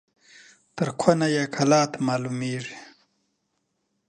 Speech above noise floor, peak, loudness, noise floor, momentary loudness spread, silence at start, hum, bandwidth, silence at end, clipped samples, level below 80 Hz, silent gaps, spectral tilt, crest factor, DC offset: 52 dB; -2 dBFS; -24 LUFS; -75 dBFS; 16 LU; 0.75 s; none; 10 kHz; 1.25 s; under 0.1%; -66 dBFS; none; -5 dB/octave; 24 dB; under 0.1%